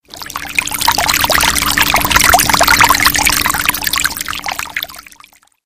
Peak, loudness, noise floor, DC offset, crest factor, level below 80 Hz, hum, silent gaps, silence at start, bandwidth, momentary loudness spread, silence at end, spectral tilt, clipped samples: 0 dBFS; -11 LUFS; -45 dBFS; 1%; 14 dB; -32 dBFS; none; none; 0.1 s; over 20 kHz; 12 LU; 0.65 s; -1 dB/octave; 0.3%